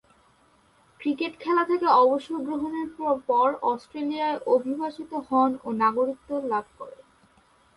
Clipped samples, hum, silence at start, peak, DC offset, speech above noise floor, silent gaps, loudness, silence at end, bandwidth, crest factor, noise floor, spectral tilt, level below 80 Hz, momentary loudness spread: under 0.1%; none; 1 s; -8 dBFS; under 0.1%; 36 dB; none; -25 LUFS; 0.8 s; 11.5 kHz; 18 dB; -61 dBFS; -6 dB/octave; -68 dBFS; 11 LU